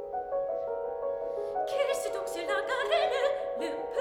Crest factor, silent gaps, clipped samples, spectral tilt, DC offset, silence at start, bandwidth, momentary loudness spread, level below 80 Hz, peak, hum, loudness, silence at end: 16 dB; none; under 0.1%; -2 dB/octave; under 0.1%; 0 s; 17 kHz; 7 LU; -64 dBFS; -16 dBFS; none; -31 LUFS; 0 s